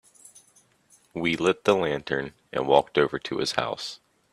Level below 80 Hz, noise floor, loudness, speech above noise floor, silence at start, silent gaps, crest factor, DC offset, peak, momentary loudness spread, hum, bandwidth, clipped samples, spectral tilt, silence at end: -60 dBFS; -61 dBFS; -25 LUFS; 36 dB; 1.15 s; none; 22 dB; under 0.1%; -4 dBFS; 12 LU; none; 13.5 kHz; under 0.1%; -4.5 dB/octave; 0.35 s